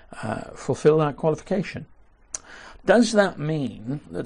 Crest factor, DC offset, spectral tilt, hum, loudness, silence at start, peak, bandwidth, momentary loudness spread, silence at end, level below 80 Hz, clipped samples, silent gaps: 18 dB; under 0.1%; -5.5 dB/octave; none; -23 LUFS; 0.1 s; -6 dBFS; 10.5 kHz; 17 LU; 0 s; -52 dBFS; under 0.1%; none